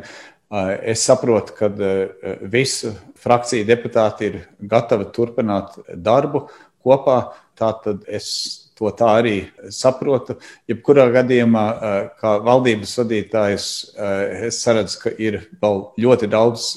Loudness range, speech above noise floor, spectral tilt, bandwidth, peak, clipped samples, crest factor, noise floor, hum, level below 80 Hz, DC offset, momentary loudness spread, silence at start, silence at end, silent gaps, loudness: 3 LU; 23 dB; -5 dB/octave; 13 kHz; 0 dBFS; under 0.1%; 18 dB; -41 dBFS; none; -56 dBFS; under 0.1%; 11 LU; 0 s; 0 s; none; -18 LUFS